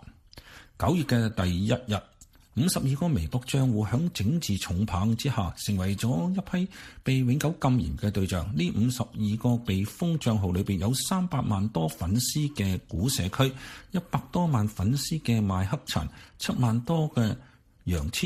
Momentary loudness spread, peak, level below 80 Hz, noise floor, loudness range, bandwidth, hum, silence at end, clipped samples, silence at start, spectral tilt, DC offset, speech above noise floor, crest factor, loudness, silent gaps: 6 LU; -8 dBFS; -46 dBFS; -50 dBFS; 1 LU; 15.5 kHz; none; 0 s; under 0.1%; 0.05 s; -5.5 dB/octave; under 0.1%; 23 dB; 18 dB; -28 LUFS; none